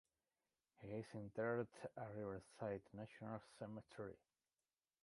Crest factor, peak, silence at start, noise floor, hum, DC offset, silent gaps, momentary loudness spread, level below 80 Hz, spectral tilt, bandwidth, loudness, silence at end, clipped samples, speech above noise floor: 22 dB; -30 dBFS; 0.8 s; under -90 dBFS; none; under 0.1%; none; 11 LU; -78 dBFS; -7.5 dB/octave; 11.5 kHz; -51 LUFS; 0.9 s; under 0.1%; over 40 dB